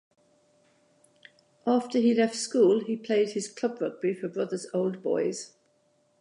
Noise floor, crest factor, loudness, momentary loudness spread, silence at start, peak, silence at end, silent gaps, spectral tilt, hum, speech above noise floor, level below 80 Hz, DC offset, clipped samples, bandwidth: -68 dBFS; 16 dB; -27 LUFS; 9 LU; 1.65 s; -12 dBFS; 0.75 s; none; -5 dB/octave; none; 42 dB; -84 dBFS; under 0.1%; under 0.1%; 11 kHz